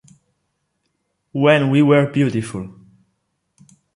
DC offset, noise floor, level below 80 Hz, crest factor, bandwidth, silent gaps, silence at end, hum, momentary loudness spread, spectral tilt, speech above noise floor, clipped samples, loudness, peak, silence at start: under 0.1%; -72 dBFS; -58 dBFS; 18 dB; 11.5 kHz; none; 1.25 s; none; 17 LU; -7 dB/octave; 56 dB; under 0.1%; -16 LUFS; -2 dBFS; 1.35 s